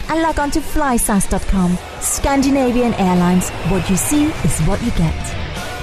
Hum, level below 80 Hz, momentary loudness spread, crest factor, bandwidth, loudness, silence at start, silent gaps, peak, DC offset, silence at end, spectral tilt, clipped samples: none; -26 dBFS; 5 LU; 10 dB; 14 kHz; -17 LUFS; 0 s; none; -6 dBFS; under 0.1%; 0 s; -5 dB/octave; under 0.1%